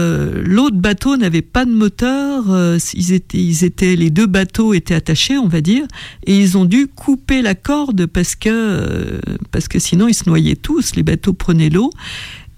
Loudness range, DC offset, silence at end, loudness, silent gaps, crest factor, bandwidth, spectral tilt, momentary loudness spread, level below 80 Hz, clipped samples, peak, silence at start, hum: 2 LU; under 0.1%; 0.05 s; -14 LUFS; none; 12 dB; 15.5 kHz; -5.5 dB/octave; 6 LU; -32 dBFS; under 0.1%; -2 dBFS; 0 s; none